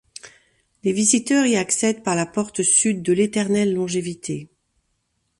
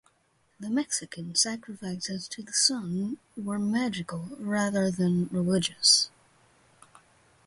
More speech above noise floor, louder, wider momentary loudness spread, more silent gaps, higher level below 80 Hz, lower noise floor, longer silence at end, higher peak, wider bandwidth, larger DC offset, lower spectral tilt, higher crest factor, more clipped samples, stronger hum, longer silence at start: first, 51 dB vs 40 dB; first, -20 LUFS vs -27 LUFS; about the same, 13 LU vs 14 LU; neither; about the same, -62 dBFS vs -66 dBFS; about the same, -71 dBFS vs -69 dBFS; second, 0.95 s vs 1.4 s; first, -4 dBFS vs -8 dBFS; about the same, 11.5 kHz vs 11.5 kHz; neither; about the same, -3.5 dB/octave vs -3 dB/octave; about the same, 18 dB vs 22 dB; neither; neither; second, 0.25 s vs 0.6 s